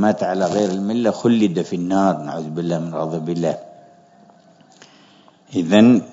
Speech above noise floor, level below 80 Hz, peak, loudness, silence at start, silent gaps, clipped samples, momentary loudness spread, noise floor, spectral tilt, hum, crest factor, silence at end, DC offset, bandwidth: 33 dB; -66 dBFS; 0 dBFS; -19 LUFS; 0 s; none; under 0.1%; 12 LU; -50 dBFS; -6.5 dB/octave; none; 20 dB; 0 s; under 0.1%; 7.8 kHz